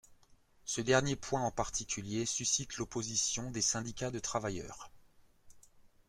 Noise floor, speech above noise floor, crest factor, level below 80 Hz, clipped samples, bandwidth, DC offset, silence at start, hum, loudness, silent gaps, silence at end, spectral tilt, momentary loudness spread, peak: -64 dBFS; 29 dB; 24 dB; -58 dBFS; under 0.1%; 15.5 kHz; under 0.1%; 0.1 s; none; -34 LUFS; none; 0.2 s; -3 dB/octave; 10 LU; -14 dBFS